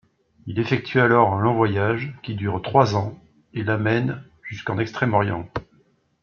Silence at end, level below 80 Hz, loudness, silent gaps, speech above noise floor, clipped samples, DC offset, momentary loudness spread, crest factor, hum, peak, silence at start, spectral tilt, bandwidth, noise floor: 0.6 s; -54 dBFS; -22 LUFS; none; 39 dB; under 0.1%; under 0.1%; 16 LU; 20 dB; none; -2 dBFS; 0.45 s; -7.5 dB/octave; 6.8 kHz; -61 dBFS